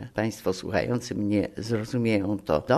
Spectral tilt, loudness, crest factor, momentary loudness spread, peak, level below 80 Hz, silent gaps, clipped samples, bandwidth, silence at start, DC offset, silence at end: -6.5 dB/octave; -27 LUFS; 18 dB; 4 LU; -8 dBFS; -54 dBFS; none; under 0.1%; 13.5 kHz; 0 s; under 0.1%; 0 s